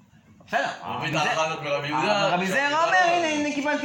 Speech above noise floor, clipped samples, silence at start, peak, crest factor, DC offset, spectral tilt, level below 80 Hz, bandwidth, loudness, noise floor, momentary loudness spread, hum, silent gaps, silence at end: 29 dB; under 0.1%; 0.5 s; -8 dBFS; 16 dB; under 0.1%; -4 dB/octave; -68 dBFS; 17 kHz; -23 LUFS; -53 dBFS; 8 LU; none; none; 0 s